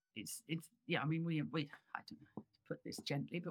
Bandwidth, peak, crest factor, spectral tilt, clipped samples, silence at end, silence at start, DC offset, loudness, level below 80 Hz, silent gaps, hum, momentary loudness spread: 18.5 kHz; -24 dBFS; 20 dB; -5 dB/octave; under 0.1%; 0 s; 0.15 s; under 0.1%; -43 LUFS; -86 dBFS; none; none; 15 LU